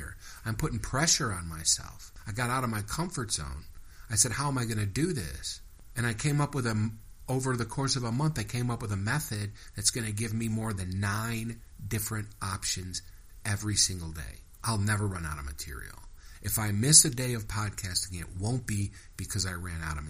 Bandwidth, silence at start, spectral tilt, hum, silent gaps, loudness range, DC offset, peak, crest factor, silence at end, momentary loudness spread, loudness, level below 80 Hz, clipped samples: 15.5 kHz; 0 s; -3.5 dB/octave; none; none; 6 LU; under 0.1%; -2 dBFS; 28 dB; 0 s; 14 LU; -30 LUFS; -46 dBFS; under 0.1%